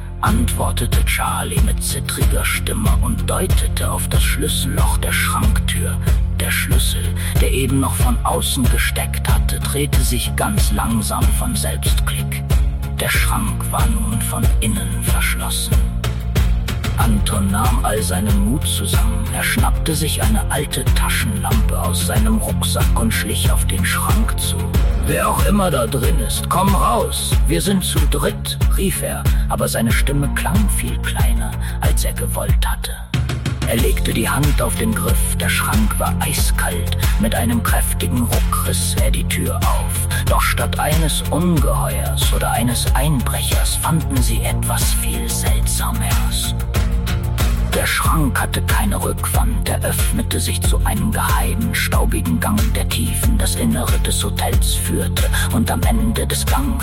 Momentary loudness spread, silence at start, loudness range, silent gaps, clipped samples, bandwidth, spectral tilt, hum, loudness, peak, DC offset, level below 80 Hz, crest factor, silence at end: 3 LU; 0 s; 1 LU; none; under 0.1%; 17 kHz; -4.5 dB/octave; none; -18 LUFS; -2 dBFS; under 0.1%; -20 dBFS; 14 dB; 0 s